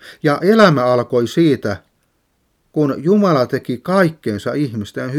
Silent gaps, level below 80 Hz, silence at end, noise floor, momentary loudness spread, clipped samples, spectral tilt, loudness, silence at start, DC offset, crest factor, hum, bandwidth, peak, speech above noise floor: none; -58 dBFS; 0 s; -64 dBFS; 12 LU; under 0.1%; -7 dB/octave; -16 LUFS; 0.05 s; under 0.1%; 16 dB; none; 15.5 kHz; 0 dBFS; 49 dB